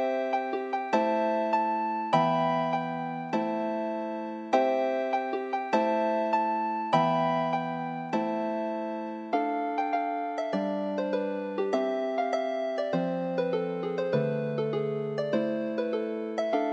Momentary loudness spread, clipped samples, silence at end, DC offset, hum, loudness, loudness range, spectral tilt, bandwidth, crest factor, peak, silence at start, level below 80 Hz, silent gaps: 6 LU; under 0.1%; 0 s; under 0.1%; none; -29 LUFS; 3 LU; -7 dB/octave; 8.4 kHz; 18 dB; -10 dBFS; 0 s; -82 dBFS; none